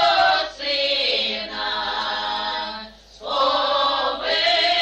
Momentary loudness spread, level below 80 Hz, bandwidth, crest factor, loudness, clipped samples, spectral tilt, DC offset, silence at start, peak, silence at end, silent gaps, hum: 10 LU; -52 dBFS; 8.8 kHz; 14 dB; -20 LUFS; under 0.1%; -1.5 dB/octave; under 0.1%; 0 s; -8 dBFS; 0 s; none; none